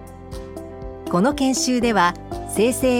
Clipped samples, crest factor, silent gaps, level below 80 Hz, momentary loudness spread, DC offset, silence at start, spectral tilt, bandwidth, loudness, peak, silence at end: under 0.1%; 18 dB; none; -40 dBFS; 17 LU; under 0.1%; 0 s; -4 dB/octave; 17 kHz; -20 LUFS; -4 dBFS; 0 s